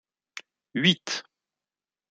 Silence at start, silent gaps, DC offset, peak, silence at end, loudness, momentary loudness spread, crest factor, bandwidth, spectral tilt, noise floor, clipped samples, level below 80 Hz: 0.35 s; none; under 0.1%; -6 dBFS; 0.9 s; -25 LUFS; 21 LU; 24 dB; 9 kHz; -4 dB/octave; under -90 dBFS; under 0.1%; -72 dBFS